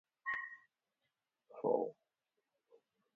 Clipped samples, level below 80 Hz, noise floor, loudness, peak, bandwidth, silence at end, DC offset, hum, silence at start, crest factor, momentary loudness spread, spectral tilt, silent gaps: under 0.1%; under -90 dBFS; -89 dBFS; -40 LUFS; -22 dBFS; 4.9 kHz; 1.25 s; under 0.1%; none; 0.25 s; 24 dB; 20 LU; -4.5 dB/octave; none